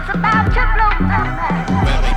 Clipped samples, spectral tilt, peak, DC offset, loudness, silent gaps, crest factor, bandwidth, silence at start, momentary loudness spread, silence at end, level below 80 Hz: under 0.1%; -6.5 dB/octave; -4 dBFS; under 0.1%; -16 LUFS; none; 10 dB; 8.6 kHz; 0 s; 4 LU; 0 s; -18 dBFS